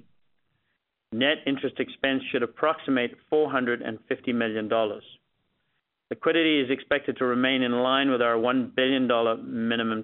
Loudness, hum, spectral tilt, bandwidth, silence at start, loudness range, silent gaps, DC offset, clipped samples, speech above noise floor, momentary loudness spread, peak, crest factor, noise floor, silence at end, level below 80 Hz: -25 LUFS; none; -2 dB/octave; 4.1 kHz; 1.1 s; 4 LU; none; under 0.1%; under 0.1%; 52 dB; 7 LU; -8 dBFS; 18 dB; -77 dBFS; 0 s; -68 dBFS